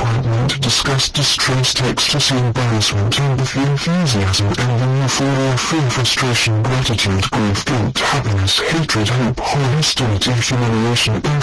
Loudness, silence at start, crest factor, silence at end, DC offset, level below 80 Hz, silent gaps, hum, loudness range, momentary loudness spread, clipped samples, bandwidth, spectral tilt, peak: -15 LUFS; 0 s; 12 dB; 0 s; under 0.1%; -38 dBFS; none; none; 1 LU; 3 LU; under 0.1%; 11 kHz; -4 dB/octave; -4 dBFS